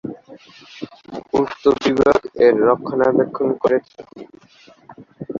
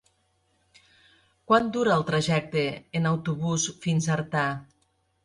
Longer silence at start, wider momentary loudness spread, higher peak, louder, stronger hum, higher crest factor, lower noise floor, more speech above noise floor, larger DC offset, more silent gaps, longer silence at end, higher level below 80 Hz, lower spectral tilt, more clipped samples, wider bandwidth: second, 0.05 s vs 1.5 s; first, 21 LU vs 5 LU; first, -2 dBFS vs -8 dBFS; first, -17 LUFS vs -26 LUFS; neither; about the same, 18 dB vs 20 dB; second, -49 dBFS vs -70 dBFS; second, 32 dB vs 45 dB; neither; neither; second, 0 s vs 0.6 s; first, -52 dBFS vs -60 dBFS; first, -6.5 dB/octave vs -5 dB/octave; neither; second, 7.4 kHz vs 11.5 kHz